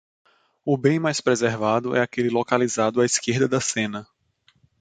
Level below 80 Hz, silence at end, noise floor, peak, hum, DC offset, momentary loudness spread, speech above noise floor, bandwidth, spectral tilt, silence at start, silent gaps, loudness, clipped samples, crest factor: -64 dBFS; 0.75 s; -64 dBFS; -4 dBFS; none; under 0.1%; 5 LU; 42 dB; 9.6 kHz; -4.5 dB/octave; 0.65 s; none; -22 LUFS; under 0.1%; 20 dB